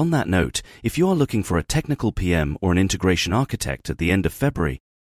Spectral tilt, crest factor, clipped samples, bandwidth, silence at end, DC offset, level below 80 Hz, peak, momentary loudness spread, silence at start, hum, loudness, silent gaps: -5.5 dB/octave; 18 dB; under 0.1%; 16 kHz; 0.35 s; under 0.1%; -36 dBFS; -4 dBFS; 7 LU; 0 s; none; -22 LUFS; none